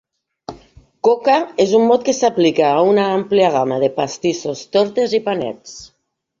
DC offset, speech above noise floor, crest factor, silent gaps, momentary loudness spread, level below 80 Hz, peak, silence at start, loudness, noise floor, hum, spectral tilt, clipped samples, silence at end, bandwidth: under 0.1%; 31 dB; 16 dB; none; 21 LU; -58 dBFS; -2 dBFS; 0.5 s; -16 LUFS; -47 dBFS; none; -5 dB/octave; under 0.1%; 0.55 s; 7.6 kHz